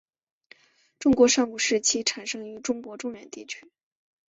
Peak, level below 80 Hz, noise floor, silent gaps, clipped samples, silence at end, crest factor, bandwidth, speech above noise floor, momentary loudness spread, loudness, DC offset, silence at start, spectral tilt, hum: -8 dBFS; -60 dBFS; -57 dBFS; none; under 0.1%; 0.75 s; 20 dB; 8.2 kHz; 32 dB; 19 LU; -24 LUFS; under 0.1%; 1 s; -2 dB/octave; none